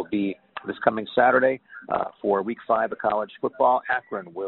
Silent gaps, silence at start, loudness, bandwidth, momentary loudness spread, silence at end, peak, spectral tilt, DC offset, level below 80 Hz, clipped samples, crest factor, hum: none; 0 s; -24 LUFS; 4.2 kHz; 11 LU; 0 s; -4 dBFS; -3.5 dB/octave; under 0.1%; -66 dBFS; under 0.1%; 20 dB; none